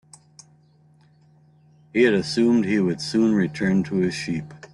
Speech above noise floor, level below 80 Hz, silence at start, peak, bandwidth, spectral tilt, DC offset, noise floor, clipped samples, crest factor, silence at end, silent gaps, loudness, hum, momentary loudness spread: 36 dB; -60 dBFS; 1.95 s; -6 dBFS; 11.5 kHz; -6 dB/octave; under 0.1%; -56 dBFS; under 0.1%; 16 dB; 0.15 s; none; -22 LUFS; none; 9 LU